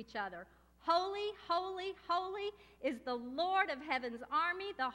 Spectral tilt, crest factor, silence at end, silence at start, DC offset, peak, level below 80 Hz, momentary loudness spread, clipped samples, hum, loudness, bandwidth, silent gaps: -3.5 dB/octave; 20 dB; 0 s; 0 s; under 0.1%; -18 dBFS; -70 dBFS; 9 LU; under 0.1%; none; -38 LUFS; 16 kHz; none